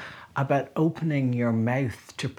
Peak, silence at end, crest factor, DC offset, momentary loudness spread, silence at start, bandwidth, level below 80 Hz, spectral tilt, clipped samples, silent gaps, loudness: -10 dBFS; 0.05 s; 18 dB; under 0.1%; 8 LU; 0 s; 14 kHz; -62 dBFS; -7.5 dB/octave; under 0.1%; none; -26 LUFS